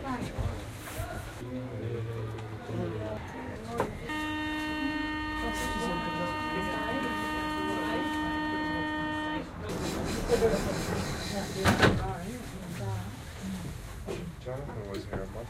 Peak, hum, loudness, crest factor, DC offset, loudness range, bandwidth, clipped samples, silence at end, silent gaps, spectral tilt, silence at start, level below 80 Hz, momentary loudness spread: -8 dBFS; none; -33 LUFS; 26 dB; under 0.1%; 7 LU; 16 kHz; under 0.1%; 0 s; none; -5 dB/octave; 0 s; -46 dBFS; 11 LU